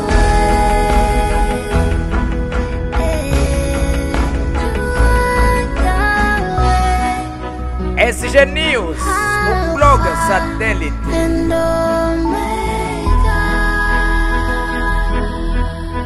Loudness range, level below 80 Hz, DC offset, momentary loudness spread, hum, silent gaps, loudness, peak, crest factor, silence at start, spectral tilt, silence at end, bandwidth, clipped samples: 3 LU; -18 dBFS; under 0.1%; 7 LU; none; none; -16 LUFS; 0 dBFS; 14 dB; 0 s; -5.5 dB/octave; 0 s; 13 kHz; under 0.1%